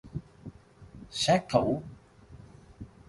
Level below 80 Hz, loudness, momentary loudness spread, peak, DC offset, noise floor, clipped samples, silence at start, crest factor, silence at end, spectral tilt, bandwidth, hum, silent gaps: -54 dBFS; -28 LUFS; 26 LU; -10 dBFS; under 0.1%; -52 dBFS; under 0.1%; 0.05 s; 22 dB; 0.25 s; -5 dB/octave; 11.5 kHz; none; none